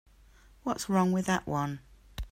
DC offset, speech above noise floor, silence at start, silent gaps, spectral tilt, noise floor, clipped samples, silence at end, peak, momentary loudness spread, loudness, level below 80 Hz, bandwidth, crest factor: under 0.1%; 29 dB; 0.65 s; none; -5.5 dB/octave; -58 dBFS; under 0.1%; 0.05 s; -14 dBFS; 18 LU; -30 LUFS; -50 dBFS; 16 kHz; 18 dB